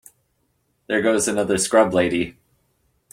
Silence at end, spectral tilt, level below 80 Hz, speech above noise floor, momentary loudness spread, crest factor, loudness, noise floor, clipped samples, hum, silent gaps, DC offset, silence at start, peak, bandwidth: 0.8 s; -3.5 dB/octave; -56 dBFS; 49 dB; 8 LU; 18 dB; -20 LUFS; -68 dBFS; under 0.1%; none; none; under 0.1%; 0.9 s; -4 dBFS; 16.5 kHz